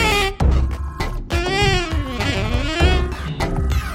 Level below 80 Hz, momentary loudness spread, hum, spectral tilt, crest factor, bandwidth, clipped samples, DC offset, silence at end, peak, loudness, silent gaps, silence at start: -22 dBFS; 8 LU; none; -5 dB/octave; 16 dB; 15.5 kHz; under 0.1%; under 0.1%; 0 s; -2 dBFS; -20 LUFS; none; 0 s